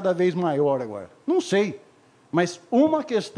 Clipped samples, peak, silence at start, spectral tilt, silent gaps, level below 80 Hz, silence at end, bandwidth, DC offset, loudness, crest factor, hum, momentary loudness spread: under 0.1%; -8 dBFS; 0 s; -6 dB/octave; none; -72 dBFS; 0 s; 10.5 kHz; under 0.1%; -23 LUFS; 16 dB; none; 10 LU